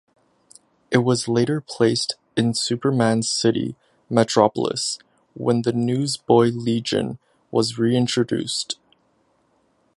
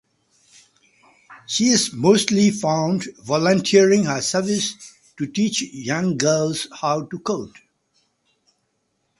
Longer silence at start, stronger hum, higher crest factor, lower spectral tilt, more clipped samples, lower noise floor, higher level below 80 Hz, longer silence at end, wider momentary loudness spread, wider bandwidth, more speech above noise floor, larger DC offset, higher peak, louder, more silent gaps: second, 0.9 s vs 1.3 s; neither; about the same, 20 dB vs 20 dB; about the same, -5 dB/octave vs -4 dB/octave; neither; second, -64 dBFS vs -71 dBFS; about the same, -60 dBFS vs -62 dBFS; second, 1.25 s vs 1.7 s; second, 8 LU vs 11 LU; about the same, 11.5 kHz vs 11.5 kHz; second, 44 dB vs 51 dB; neither; about the same, 0 dBFS vs -2 dBFS; about the same, -21 LUFS vs -20 LUFS; neither